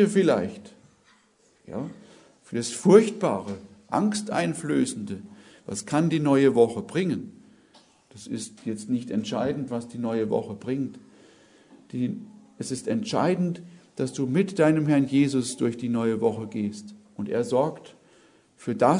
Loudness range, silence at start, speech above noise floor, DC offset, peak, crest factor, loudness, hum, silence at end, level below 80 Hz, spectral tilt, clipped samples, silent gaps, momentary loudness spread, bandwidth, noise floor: 6 LU; 0 s; 38 dB; under 0.1%; -2 dBFS; 24 dB; -25 LUFS; none; 0 s; -68 dBFS; -6 dB/octave; under 0.1%; none; 17 LU; 11 kHz; -62 dBFS